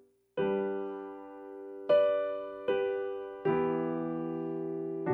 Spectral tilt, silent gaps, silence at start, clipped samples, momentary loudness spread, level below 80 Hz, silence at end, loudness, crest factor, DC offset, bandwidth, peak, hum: -9 dB/octave; none; 0.35 s; under 0.1%; 16 LU; -72 dBFS; 0 s; -33 LUFS; 16 dB; under 0.1%; 4.5 kHz; -16 dBFS; none